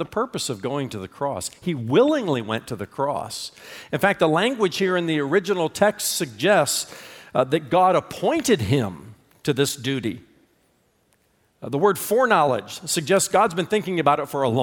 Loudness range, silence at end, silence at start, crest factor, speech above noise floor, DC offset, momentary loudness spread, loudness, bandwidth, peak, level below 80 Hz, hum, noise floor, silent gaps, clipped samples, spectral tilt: 4 LU; 0 s; 0 s; 20 dB; 42 dB; under 0.1%; 12 LU; -22 LUFS; 19 kHz; -4 dBFS; -60 dBFS; none; -64 dBFS; none; under 0.1%; -4.5 dB/octave